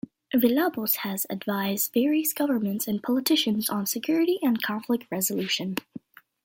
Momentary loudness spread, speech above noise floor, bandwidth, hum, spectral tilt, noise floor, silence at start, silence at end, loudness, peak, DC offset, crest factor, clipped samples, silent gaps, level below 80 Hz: 6 LU; 20 dB; 17 kHz; none; -3.5 dB/octave; -46 dBFS; 0.35 s; 0.45 s; -25 LUFS; -8 dBFS; under 0.1%; 18 dB; under 0.1%; none; -70 dBFS